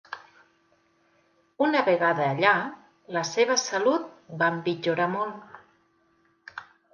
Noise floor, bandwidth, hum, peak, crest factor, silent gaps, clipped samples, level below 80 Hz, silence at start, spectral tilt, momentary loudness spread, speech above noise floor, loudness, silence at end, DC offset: -66 dBFS; 10 kHz; none; -6 dBFS; 22 dB; none; under 0.1%; -76 dBFS; 0.1 s; -4 dB/octave; 20 LU; 42 dB; -25 LUFS; 0.3 s; under 0.1%